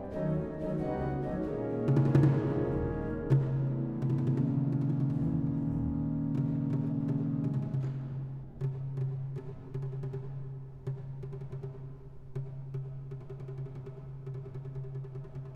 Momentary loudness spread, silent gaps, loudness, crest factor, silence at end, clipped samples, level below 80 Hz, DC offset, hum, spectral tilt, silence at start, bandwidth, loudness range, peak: 13 LU; none; -33 LUFS; 20 dB; 0 s; under 0.1%; -52 dBFS; under 0.1%; none; -11 dB/octave; 0 s; 4.4 kHz; 12 LU; -14 dBFS